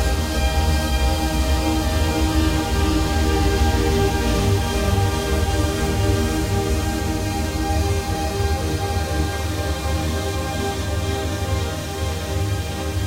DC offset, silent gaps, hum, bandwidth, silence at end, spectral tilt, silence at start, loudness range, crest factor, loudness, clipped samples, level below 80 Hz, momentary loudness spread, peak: under 0.1%; none; none; 16 kHz; 0 s; -5 dB/octave; 0 s; 4 LU; 14 dB; -21 LUFS; under 0.1%; -24 dBFS; 5 LU; -6 dBFS